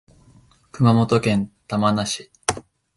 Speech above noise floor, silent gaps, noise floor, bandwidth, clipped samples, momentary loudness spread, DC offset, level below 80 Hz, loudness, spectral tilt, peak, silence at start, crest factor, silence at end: 35 dB; none; -53 dBFS; 11.5 kHz; under 0.1%; 9 LU; under 0.1%; -50 dBFS; -21 LUFS; -5.5 dB/octave; -2 dBFS; 0.75 s; 20 dB; 0.35 s